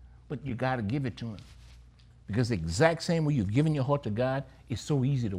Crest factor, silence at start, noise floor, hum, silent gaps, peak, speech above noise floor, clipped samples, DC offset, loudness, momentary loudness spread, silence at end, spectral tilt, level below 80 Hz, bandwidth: 20 dB; 0 s; -55 dBFS; none; none; -10 dBFS; 26 dB; under 0.1%; under 0.1%; -29 LUFS; 13 LU; 0 s; -6.5 dB/octave; -52 dBFS; 11.5 kHz